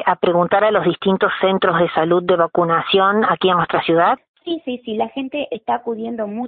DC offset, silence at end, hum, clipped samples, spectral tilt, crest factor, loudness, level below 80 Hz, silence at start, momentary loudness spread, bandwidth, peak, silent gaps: under 0.1%; 0 s; none; under 0.1%; -11 dB/octave; 16 dB; -17 LUFS; -56 dBFS; 0 s; 10 LU; 4.6 kHz; -2 dBFS; 4.28-4.34 s